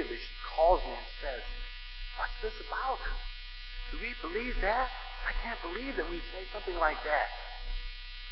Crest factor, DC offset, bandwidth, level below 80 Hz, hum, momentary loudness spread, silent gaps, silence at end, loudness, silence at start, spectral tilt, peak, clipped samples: 22 dB; under 0.1%; 6 kHz; -40 dBFS; none; 14 LU; none; 0 s; -35 LUFS; 0 s; -7 dB/octave; -12 dBFS; under 0.1%